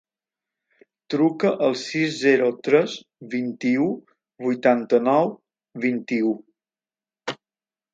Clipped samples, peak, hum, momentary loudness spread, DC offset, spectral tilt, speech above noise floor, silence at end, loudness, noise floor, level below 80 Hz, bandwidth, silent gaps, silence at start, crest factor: under 0.1%; -4 dBFS; none; 15 LU; under 0.1%; -5.5 dB/octave; over 69 dB; 0.6 s; -22 LUFS; under -90 dBFS; -74 dBFS; 9 kHz; none; 1.1 s; 20 dB